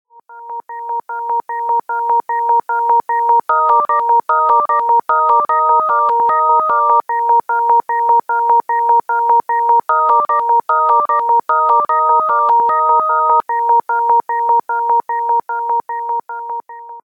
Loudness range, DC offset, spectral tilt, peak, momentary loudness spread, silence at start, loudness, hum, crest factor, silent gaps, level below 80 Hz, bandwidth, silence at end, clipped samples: 3 LU; under 0.1%; -4.5 dB/octave; -2 dBFS; 8 LU; 0.3 s; -14 LUFS; none; 12 dB; none; -74 dBFS; 4 kHz; 0.05 s; under 0.1%